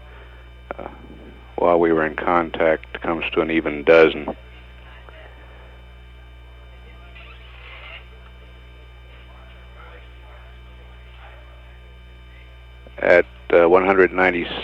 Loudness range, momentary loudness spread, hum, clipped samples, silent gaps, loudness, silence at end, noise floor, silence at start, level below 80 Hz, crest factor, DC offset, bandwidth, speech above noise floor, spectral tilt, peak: 24 LU; 28 LU; 60 Hz at -40 dBFS; under 0.1%; none; -18 LUFS; 0 s; -42 dBFS; 0 s; -42 dBFS; 22 dB; under 0.1%; 6.8 kHz; 23 dB; -7 dB/octave; 0 dBFS